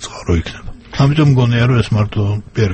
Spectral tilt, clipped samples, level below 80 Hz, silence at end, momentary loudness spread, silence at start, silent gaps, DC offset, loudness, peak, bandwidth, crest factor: -7 dB/octave; under 0.1%; -32 dBFS; 0 s; 13 LU; 0 s; none; under 0.1%; -14 LUFS; 0 dBFS; 8.6 kHz; 14 dB